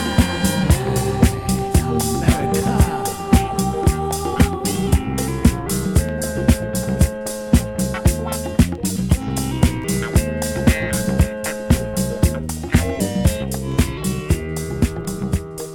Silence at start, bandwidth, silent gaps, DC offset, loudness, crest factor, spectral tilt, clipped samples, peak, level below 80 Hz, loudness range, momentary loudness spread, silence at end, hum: 0 s; 17.5 kHz; none; under 0.1%; -20 LUFS; 18 dB; -5.5 dB/octave; under 0.1%; 0 dBFS; -26 dBFS; 2 LU; 5 LU; 0 s; none